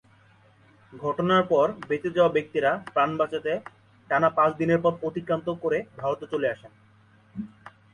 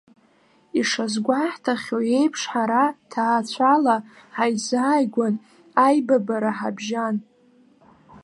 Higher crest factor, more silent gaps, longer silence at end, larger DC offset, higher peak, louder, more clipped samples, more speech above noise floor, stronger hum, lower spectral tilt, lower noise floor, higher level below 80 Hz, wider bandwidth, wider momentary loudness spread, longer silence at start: about the same, 18 dB vs 20 dB; neither; first, 0.25 s vs 0.05 s; neither; second, -8 dBFS vs -4 dBFS; second, -25 LUFS vs -22 LUFS; neither; second, 33 dB vs 38 dB; neither; first, -7 dB/octave vs -4.5 dB/octave; about the same, -57 dBFS vs -59 dBFS; first, -64 dBFS vs -74 dBFS; second, 10 kHz vs 11.5 kHz; first, 12 LU vs 8 LU; first, 0.9 s vs 0.75 s